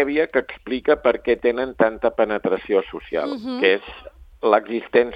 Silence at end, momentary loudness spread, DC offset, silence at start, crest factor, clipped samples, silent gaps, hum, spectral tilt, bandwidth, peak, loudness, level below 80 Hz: 0 s; 7 LU; under 0.1%; 0 s; 20 dB; under 0.1%; none; none; -7 dB/octave; 5.4 kHz; 0 dBFS; -21 LUFS; -50 dBFS